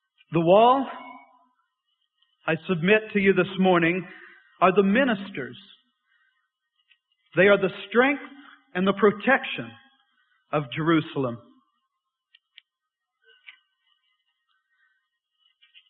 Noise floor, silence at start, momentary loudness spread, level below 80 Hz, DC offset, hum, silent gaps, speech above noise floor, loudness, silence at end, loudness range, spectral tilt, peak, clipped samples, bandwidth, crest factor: -85 dBFS; 0.3 s; 16 LU; -64 dBFS; under 0.1%; none; none; 63 dB; -23 LUFS; 4.5 s; 8 LU; -10.5 dB/octave; -6 dBFS; under 0.1%; 4.2 kHz; 20 dB